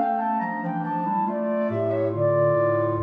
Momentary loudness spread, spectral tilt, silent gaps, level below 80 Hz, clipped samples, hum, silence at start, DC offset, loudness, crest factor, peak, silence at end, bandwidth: 6 LU; -11 dB/octave; none; -64 dBFS; under 0.1%; none; 0 s; under 0.1%; -24 LUFS; 12 dB; -10 dBFS; 0 s; 4.7 kHz